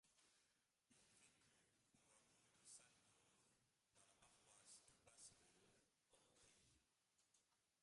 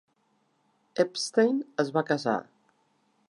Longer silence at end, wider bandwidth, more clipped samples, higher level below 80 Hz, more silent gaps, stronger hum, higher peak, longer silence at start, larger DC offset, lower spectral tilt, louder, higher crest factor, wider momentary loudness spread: second, 0 s vs 0.9 s; about the same, 11.5 kHz vs 11.5 kHz; neither; second, under -90 dBFS vs -82 dBFS; neither; neither; second, -52 dBFS vs -10 dBFS; second, 0.05 s vs 0.95 s; neither; second, -1 dB/octave vs -4.5 dB/octave; second, -67 LUFS vs -28 LUFS; about the same, 24 dB vs 20 dB; second, 2 LU vs 7 LU